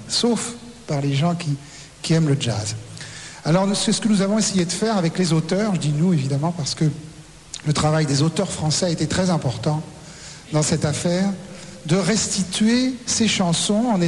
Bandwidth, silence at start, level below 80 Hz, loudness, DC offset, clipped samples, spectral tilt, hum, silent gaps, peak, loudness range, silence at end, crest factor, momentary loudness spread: 12 kHz; 0 s; -50 dBFS; -21 LUFS; 0.2%; under 0.1%; -5 dB/octave; none; none; -6 dBFS; 3 LU; 0 s; 14 dB; 15 LU